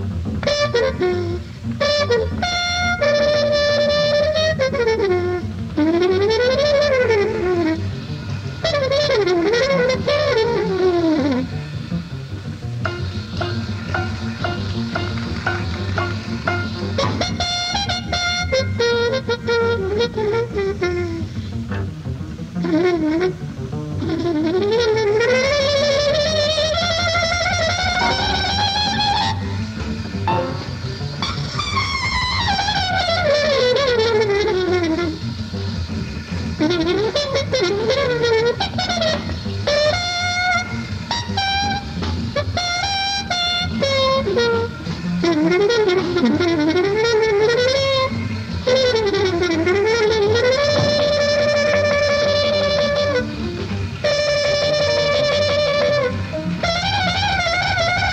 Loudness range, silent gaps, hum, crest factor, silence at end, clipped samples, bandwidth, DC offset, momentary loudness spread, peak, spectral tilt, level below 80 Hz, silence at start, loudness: 5 LU; none; none; 12 dB; 0 s; under 0.1%; 10.5 kHz; under 0.1%; 9 LU; -6 dBFS; -5 dB/octave; -38 dBFS; 0 s; -19 LUFS